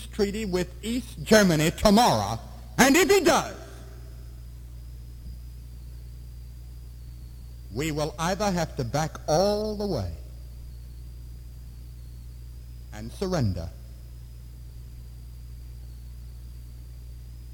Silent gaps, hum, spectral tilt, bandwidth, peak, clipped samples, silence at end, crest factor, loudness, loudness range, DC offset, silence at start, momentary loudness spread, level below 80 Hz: none; 60 Hz at -40 dBFS; -4.5 dB/octave; 19.5 kHz; -6 dBFS; under 0.1%; 0 s; 22 dB; -24 LUFS; 22 LU; under 0.1%; 0 s; 24 LU; -40 dBFS